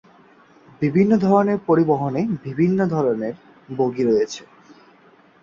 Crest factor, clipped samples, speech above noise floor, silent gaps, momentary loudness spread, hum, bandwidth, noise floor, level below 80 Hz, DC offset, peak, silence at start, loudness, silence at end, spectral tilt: 16 dB; under 0.1%; 34 dB; none; 11 LU; none; 7.4 kHz; -52 dBFS; -60 dBFS; under 0.1%; -4 dBFS; 0.8 s; -20 LUFS; 1 s; -8 dB/octave